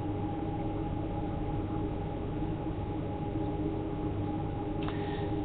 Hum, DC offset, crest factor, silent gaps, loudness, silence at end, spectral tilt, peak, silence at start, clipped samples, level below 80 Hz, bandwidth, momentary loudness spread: none; under 0.1%; 16 dB; none; -35 LUFS; 0 s; -8 dB/octave; -18 dBFS; 0 s; under 0.1%; -42 dBFS; 4.4 kHz; 2 LU